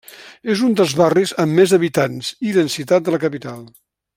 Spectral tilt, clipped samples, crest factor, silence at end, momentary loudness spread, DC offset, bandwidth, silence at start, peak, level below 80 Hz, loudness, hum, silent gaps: -5.5 dB/octave; under 0.1%; 16 dB; 0.5 s; 13 LU; under 0.1%; 16.5 kHz; 0.2 s; -2 dBFS; -60 dBFS; -17 LUFS; none; none